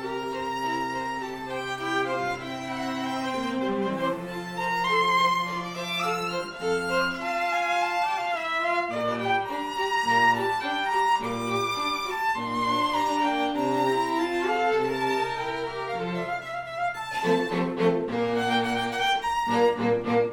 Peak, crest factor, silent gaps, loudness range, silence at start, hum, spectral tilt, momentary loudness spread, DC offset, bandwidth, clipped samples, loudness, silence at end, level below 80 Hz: -10 dBFS; 16 dB; none; 4 LU; 0 s; none; -4.5 dB/octave; 7 LU; under 0.1%; 19.5 kHz; under 0.1%; -26 LUFS; 0 s; -58 dBFS